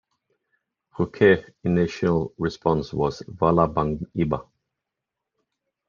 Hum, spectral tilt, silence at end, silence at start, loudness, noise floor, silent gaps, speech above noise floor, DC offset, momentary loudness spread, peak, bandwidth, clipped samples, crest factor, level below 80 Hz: none; -8 dB/octave; 1.45 s; 1 s; -23 LUFS; -85 dBFS; none; 62 dB; under 0.1%; 10 LU; -4 dBFS; 7.2 kHz; under 0.1%; 20 dB; -48 dBFS